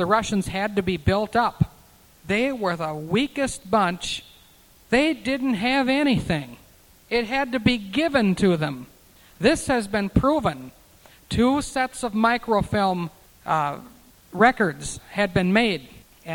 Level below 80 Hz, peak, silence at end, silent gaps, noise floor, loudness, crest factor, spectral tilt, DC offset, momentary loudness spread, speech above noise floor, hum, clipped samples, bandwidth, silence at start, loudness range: -44 dBFS; -2 dBFS; 0 s; none; -53 dBFS; -23 LUFS; 22 dB; -5.5 dB/octave; under 0.1%; 10 LU; 31 dB; none; under 0.1%; 19 kHz; 0 s; 2 LU